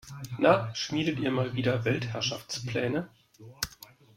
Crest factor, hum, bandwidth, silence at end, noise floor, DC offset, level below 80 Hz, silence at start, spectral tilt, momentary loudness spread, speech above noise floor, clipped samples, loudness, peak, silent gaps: 22 dB; none; 16.5 kHz; 0.3 s; -53 dBFS; under 0.1%; -60 dBFS; 0.05 s; -5 dB/octave; 12 LU; 25 dB; under 0.1%; -29 LUFS; -8 dBFS; none